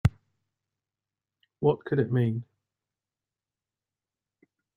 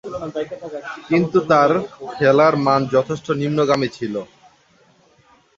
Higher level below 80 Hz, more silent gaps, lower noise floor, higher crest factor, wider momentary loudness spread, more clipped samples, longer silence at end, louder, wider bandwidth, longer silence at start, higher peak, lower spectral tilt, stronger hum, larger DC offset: about the same, -52 dBFS vs -56 dBFS; neither; first, under -90 dBFS vs -55 dBFS; first, 24 dB vs 18 dB; second, 4 LU vs 15 LU; neither; first, 2.35 s vs 1.3 s; second, -28 LUFS vs -18 LUFS; first, 9.4 kHz vs 7.8 kHz; about the same, 0.05 s vs 0.05 s; second, -8 dBFS vs -2 dBFS; first, -9 dB/octave vs -6.5 dB/octave; neither; neither